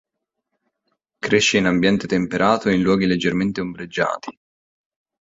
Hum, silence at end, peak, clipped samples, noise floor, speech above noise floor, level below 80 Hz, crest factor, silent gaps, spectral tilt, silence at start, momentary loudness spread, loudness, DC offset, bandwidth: none; 0.9 s; -2 dBFS; under 0.1%; -78 dBFS; 59 dB; -52 dBFS; 18 dB; none; -5 dB/octave; 1.25 s; 11 LU; -19 LUFS; under 0.1%; 7.8 kHz